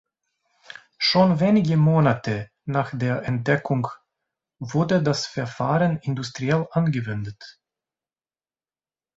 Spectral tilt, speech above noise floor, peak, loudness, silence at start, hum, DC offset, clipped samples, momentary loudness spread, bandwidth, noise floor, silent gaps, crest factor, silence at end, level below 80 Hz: -6.5 dB/octave; over 68 dB; -4 dBFS; -22 LUFS; 1 s; none; under 0.1%; under 0.1%; 14 LU; 7.8 kHz; under -90 dBFS; none; 18 dB; 1.65 s; -58 dBFS